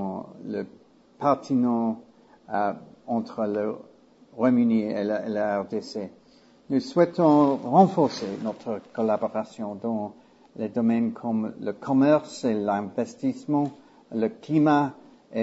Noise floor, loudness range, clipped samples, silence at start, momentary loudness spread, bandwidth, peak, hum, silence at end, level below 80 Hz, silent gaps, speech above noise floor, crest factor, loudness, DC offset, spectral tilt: -56 dBFS; 5 LU; under 0.1%; 0 s; 14 LU; 8 kHz; -4 dBFS; none; 0 s; -70 dBFS; none; 32 dB; 20 dB; -25 LUFS; under 0.1%; -7.5 dB/octave